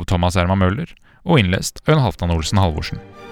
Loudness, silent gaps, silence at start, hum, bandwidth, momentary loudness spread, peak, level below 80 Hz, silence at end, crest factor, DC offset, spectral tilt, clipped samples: -18 LUFS; none; 0 s; none; 15.5 kHz; 13 LU; 0 dBFS; -36 dBFS; 0 s; 18 dB; under 0.1%; -6 dB/octave; under 0.1%